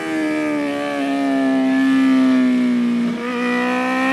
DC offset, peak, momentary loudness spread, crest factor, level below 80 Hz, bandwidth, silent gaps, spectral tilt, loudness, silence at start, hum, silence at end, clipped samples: under 0.1%; -6 dBFS; 7 LU; 10 dB; -64 dBFS; 12 kHz; none; -5 dB/octave; -18 LUFS; 0 s; none; 0 s; under 0.1%